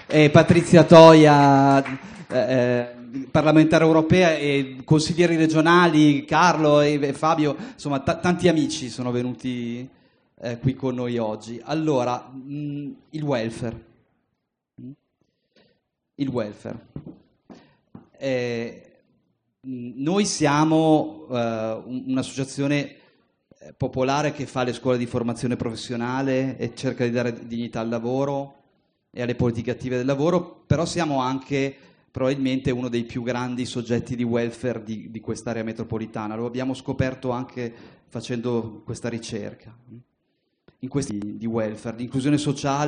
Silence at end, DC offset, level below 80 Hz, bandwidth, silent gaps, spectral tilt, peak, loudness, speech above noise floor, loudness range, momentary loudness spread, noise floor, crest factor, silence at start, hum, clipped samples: 0 s; under 0.1%; -56 dBFS; 10 kHz; none; -6 dB/octave; 0 dBFS; -21 LUFS; 57 dB; 14 LU; 17 LU; -78 dBFS; 22 dB; 0.1 s; none; under 0.1%